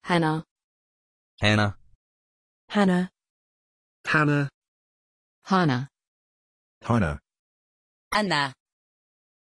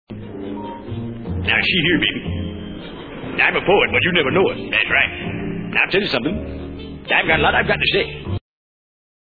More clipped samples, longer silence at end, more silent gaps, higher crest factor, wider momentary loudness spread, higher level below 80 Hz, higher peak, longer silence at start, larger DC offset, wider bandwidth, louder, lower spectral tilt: neither; about the same, 0.9 s vs 1 s; first, 0.51-0.56 s, 0.64-1.38 s, 1.95-2.68 s, 3.30-4.04 s, 4.54-4.62 s, 4.68-5.42 s, 6.07-6.81 s, 7.39-8.11 s vs none; about the same, 22 dB vs 18 dB; second, 12 LU vs 16 LU; second, -52 dBFS vs -40 dBFS; second, -6 dBFS vs -2 dBFS; about the same, 0.05 s vs 0.1 s; neither; first, 11 kHz vs 4.9 kHz; second, -25 LUFS vs -17 LUFS; second, -6 dB/octave vs -7.5 dB/octave